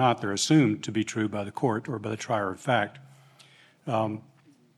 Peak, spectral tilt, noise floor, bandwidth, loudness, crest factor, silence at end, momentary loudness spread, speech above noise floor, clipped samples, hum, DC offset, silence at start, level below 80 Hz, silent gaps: -10 dBFS; -5 dB/octave; -57 dBFS; 13 kHz; -27 LUFS; 18 dB; 0.6 s; 11 LU; 30 dB; under 0.1%; none; under 0.1%; 0 s; -78 dBFS; none